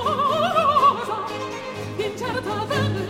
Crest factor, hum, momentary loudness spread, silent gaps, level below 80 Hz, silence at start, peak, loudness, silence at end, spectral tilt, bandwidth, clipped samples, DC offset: 16 dB; none; 13 LU; none; -54 dBFS; 0 s; -6 dBFS; -22 LUFS; 0 s; -5 dB/octave; 16.5 kHz; under 0.1%; under 0.1%